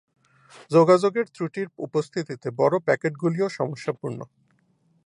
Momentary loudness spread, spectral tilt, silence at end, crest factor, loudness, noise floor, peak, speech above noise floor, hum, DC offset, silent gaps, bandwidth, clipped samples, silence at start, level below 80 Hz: 14 LU; -7 dB/octave; 0.8 s; 20 dB; -24 LUFS; -65 dBFS; -4 dBFS; 42 dB; none; under 0.1%; none; 11 kHz; under 0.1%; 0.6 s; -74 dBFS